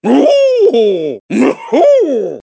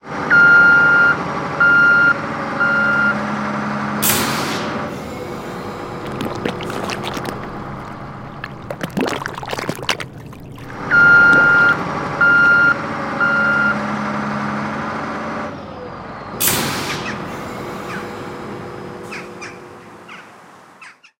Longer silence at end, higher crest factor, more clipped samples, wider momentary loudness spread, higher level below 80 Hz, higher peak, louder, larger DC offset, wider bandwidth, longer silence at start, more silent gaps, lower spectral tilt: second, 0.05 s vs 0.3 s; second, 10 dB vs 18 dB; neither; second, 6 LU vs 21 LU; second, -66 dBFS vs -48 dBFS; about the same, 0 dBFS vs 0 dBFS; first, -10 LUFS vs -15 LUFS; neither; second, 8 kHz vs 17 kHz; about the same, 0.05 s vs 0.05 s; first, 1.20-1.29 s vs none; first, -5.5 dB/octave vs -3.5 dB/octave